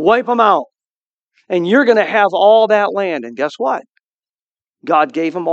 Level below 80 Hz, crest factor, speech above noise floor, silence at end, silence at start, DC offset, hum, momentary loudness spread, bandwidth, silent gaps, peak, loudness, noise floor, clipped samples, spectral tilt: -66 dBFS; 14 dB; over 77 dB; 0 s; 0 s; under 0.1%; none; 10 LU; 7.8 kHz; 0.86-1.27 s, 4.03-4.22 s, 4.29-4.55 s, 4.69-4.73 s; 0 dBFS; -14 LUFS; under -90 dBFS; under 0.1%; -6 dB/octave